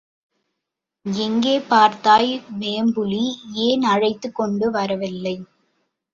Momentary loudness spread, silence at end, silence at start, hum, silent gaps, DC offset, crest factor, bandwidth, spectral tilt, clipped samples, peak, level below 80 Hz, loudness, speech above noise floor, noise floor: 12 LU; 0.7 s; 1.05 s; none; none; under 0.1%; 18 dB; 7.6 kHz; -5 dB/octave; under 0.1%; -2 dBFS; -62 dBFS; -20 LUFS; 63 dB; -82 dBFS